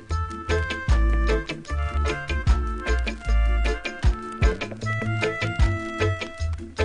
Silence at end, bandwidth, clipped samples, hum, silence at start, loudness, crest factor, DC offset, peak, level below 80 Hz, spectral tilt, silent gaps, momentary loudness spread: 0 s; 10 kHz; under 0.1%; none; 0 s; -26 LUFS; 16 dB; under 0.1%; -8 dBFS; -24 dBFS; -6 dB/octave; none; 6 LU